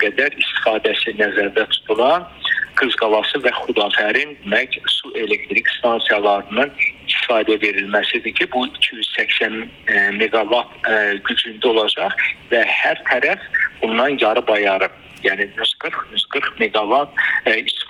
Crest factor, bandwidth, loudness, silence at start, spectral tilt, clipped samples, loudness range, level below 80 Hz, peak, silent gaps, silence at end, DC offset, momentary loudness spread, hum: 18 dB; 11.5 kHz; -17 LUFS; 0 s; -3.5 dB/octave; under 0.1%; 1 LU; -56 dBFS; 0 dBFS; none; 0.05 s; under 0.1%; 4 LU; none